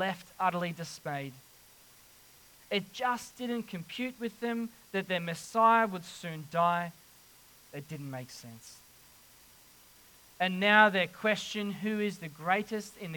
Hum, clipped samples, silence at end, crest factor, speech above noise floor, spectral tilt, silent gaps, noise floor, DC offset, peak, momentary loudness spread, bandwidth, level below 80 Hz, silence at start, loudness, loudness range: none; under 0.1%; 0 s; 24 dB; 27 dB; -4.5 dB/octave; none; -58 dBFS; under 0.1%; -8 dBFS; 18 LU; 19 kHz; -74 dBFS; 0 s; -31 LUFS; 9 LU